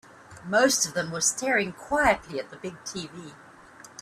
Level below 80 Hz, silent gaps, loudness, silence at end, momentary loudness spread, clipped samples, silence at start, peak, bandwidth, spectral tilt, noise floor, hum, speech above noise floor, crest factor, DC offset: -54 dBFS; none; -25 LUFS; 0.15 s; 21 LU; under 0.1%; 0.3 s; -6 dBFS; 15.5 kHz; -2 dB/octave; -49 dBFS; none; 23 dB; 20 dB; under 0.1%